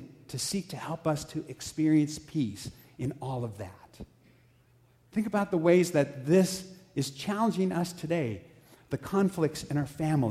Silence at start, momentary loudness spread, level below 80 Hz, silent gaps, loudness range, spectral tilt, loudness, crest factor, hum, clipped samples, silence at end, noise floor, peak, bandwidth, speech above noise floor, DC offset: 0 s; 16 LU; -60 dBFS; none; 6 LU; -6 dB/octave; -30 LUFS; 20 dB; none; under 0.1%; 0 s; -63 dBFS; -10 dBFS; 15.5 kHz; 34 dB; under 0.1%